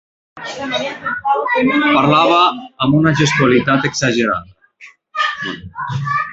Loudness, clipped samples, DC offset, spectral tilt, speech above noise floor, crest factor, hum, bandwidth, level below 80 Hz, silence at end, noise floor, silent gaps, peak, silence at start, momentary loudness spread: -15 LUFS; under 0.1%; under 0.1%; -5 dB/octave; 29 dB; 16 dB; none; 8.2 kHz; -50 dBFS; 0 s; -44 dBFS; none; 0 dBFS; 0.35 s; 13 LU